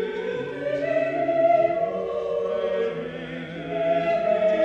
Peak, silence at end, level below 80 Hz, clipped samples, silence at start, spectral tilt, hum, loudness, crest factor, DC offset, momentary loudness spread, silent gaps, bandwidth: -10 dBFS; 0 s; -58 dBFS; under 0.1%; 0 s; -7 dB/octave; none; -25 LUFS; 14 dB; under 0.1%; 12 LU; none; 7.2 kHz